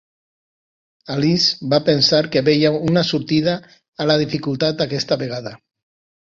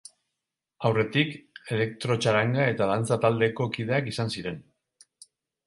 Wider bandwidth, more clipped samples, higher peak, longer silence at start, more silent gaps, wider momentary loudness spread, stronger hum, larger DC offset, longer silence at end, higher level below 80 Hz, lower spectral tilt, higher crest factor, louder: second, 7.6 kHz vs 11.5 kHz; neither; first, -2 dBFS vs -8 dBFS; first, 1.1 s vs 0.8 s; first, 3.88-3.93 s vs none; about the same, 11 LU vs 9 LU; neither; neither; second, 0.75 s vs 1.05 s; first, -54 dBFS vs -62 dBFS; about the same, -5.5 dB/octave vs -6 dB/octave; about the same, 18 dB vs 20 dB; first, -18 LUFS vs -26 LUFS